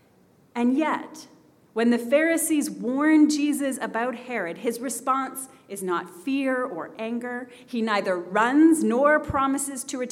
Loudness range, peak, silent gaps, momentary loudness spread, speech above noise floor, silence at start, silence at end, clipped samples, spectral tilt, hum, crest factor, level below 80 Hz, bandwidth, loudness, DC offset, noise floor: 5 LU; -8 dBFS; none; 14 LU; 35 dB; 0.55 s; 0 s; under 0.1%; -4 dB/octave; none; 16 dB; -58 dBFS; 15.5 kHz; -24 LUFS; under 0.1%; -59 dBFS